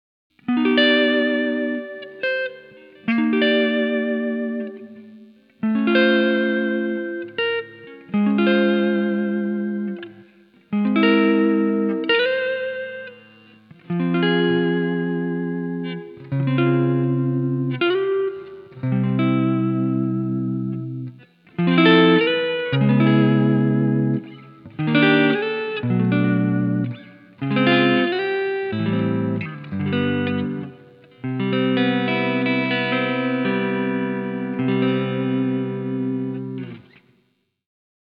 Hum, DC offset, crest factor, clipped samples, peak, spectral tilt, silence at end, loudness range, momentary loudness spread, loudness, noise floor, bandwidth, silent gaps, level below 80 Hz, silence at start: none; under 0.1%; 20 dB; under 0.1%; -2 dBFS; -9.5 dB/octave; 1.3 s; 5 LU; 14 LU; -20 LUFS; -67 dBFS; 5.2 kHz; none; -70 dBFS; 0.5 s